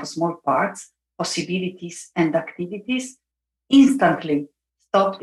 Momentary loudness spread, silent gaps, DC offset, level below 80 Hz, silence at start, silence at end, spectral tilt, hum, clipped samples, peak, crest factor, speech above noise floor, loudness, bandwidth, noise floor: 16 LU; none; under 0.1%; -62 dBFS; 0 s; 0 s; -5 dB/octave; none; under 0.1%; -4 dBFS; 18 dB; 63 dB; -21 LUFS; 12 kHz; -83 dBFS